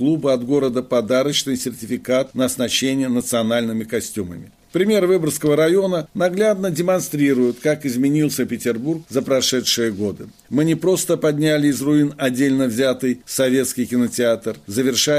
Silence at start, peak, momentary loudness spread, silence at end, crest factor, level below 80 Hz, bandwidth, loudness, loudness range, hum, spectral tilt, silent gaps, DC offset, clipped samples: 0 s; -4 dBFS; 7 LU; 0 s; 14 dB; -58 dBFS; 15.5 kHz; -19 LUFS; 2 LU; none; -4.5 dB/octave; none; under 0.1%; under 0.1%